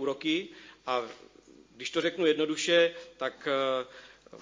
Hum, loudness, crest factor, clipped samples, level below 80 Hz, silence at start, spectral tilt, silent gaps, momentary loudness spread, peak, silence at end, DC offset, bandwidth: none; -29 LUFS; 20 dB; under 0.1%; -74 dBFS; 0 s; -3 dB/octave; none; 16 LU; -12 dBFS; 0 s; under 0.1%; 7.6 kHz